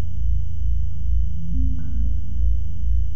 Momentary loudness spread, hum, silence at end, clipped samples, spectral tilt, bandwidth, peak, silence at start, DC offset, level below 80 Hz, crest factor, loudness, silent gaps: 2 LU; none; 0 s; under 0.1%; -9 dB/octave; 3.2 kHz; -8 dBFS; 0 s; 20%; -24 dBFS; 10 dB; -26 LUFS; none